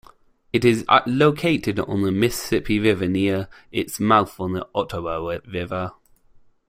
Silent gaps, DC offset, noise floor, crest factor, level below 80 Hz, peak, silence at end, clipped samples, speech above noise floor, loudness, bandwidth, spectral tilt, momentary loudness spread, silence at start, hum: none; under 0.1%; -53 dBFS; 20 dB; -48 dBFS; -2 dBFS; 0.8 s; under 0.1%; 32 dB; -21 LUFS; 16 kHz; -5.5 dB/octave; 10 LU; 0.55 s; none